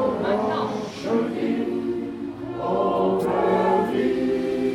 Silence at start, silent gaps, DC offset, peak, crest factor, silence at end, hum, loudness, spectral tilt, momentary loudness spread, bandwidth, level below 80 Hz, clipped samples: 0 s; none; under 0.1%; -8 dBFS; 14 dB; 0 s; none; -24 LUFS; -7 dB/octave; 9 LU; 15.5 kHz; -54 dBFS; under 0.1%